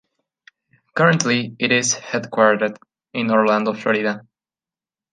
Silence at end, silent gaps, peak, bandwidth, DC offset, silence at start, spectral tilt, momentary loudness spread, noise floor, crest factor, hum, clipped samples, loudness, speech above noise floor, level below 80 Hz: 0.95 s; none; -2 dBFS; 10 kHz; under 0.1%; 0.95 s; -4 dB/octave; 9 LU; under -90 dBFS; 18 dB; none; under 0.1%; -19 LUFS; over 72 dB; -70 dBFS